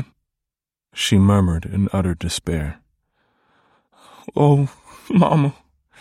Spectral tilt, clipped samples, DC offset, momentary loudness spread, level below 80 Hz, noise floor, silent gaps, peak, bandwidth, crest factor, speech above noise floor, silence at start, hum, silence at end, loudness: -6.5 dB/octave; under 0.1%; under 0.1%; 12 LU; -40 dBFS; -87 dBFS; none; -4 dBFS; 14 kHz; 16 dB; 70 dB; 0 s; none; 0.5 s; -19 LUFS